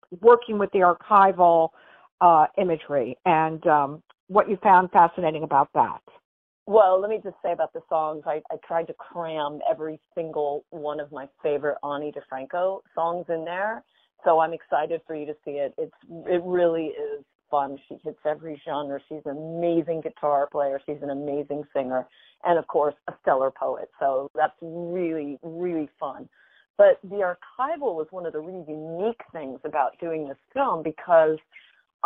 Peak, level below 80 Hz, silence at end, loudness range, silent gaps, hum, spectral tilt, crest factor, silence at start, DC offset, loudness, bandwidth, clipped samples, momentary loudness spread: -4 dBFS; -68 dBFS; 0.7 s; 9 LU; 2.12-2.18 s, 4.20-4.27 s, 6.25-6.66 s, 17.35-17.39 s, 24.30-24.34 s, 26.70-26.74 s; none; -9 dB/octave; 20 dB; 0.1 s; under 0.1%; -24 LUFS; 4.1 kHz; under 0.1%; 16 LU